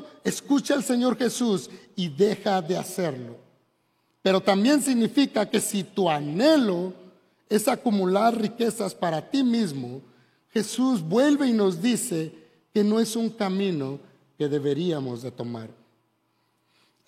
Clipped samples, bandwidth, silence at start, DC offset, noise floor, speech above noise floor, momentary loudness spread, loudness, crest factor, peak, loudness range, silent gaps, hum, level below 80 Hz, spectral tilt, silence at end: under 0.1%; 16 kHz; 0 s; under 0.1%; -70 dBFS; 46 dB; 13 LU; -24 LUFS; 18 dB; -6 dBFS; 5 LU; none; none; -76 dBFS; -5 dB/octave; 1.35 s